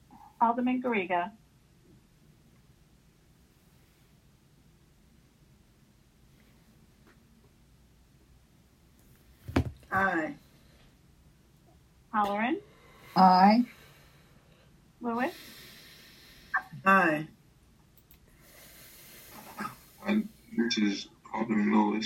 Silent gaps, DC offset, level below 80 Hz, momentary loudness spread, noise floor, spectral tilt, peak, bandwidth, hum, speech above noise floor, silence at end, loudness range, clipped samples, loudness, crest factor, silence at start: none; under 0.1%; -58 dBFS; 26 LU; -62 dBFS; -6 dB/octave; -8 dBFS; 16.5 kHz; none; 36 dB; 0 s; 11 LU; under 0.1%; -28 LUFS; 24 dB; 0.4 s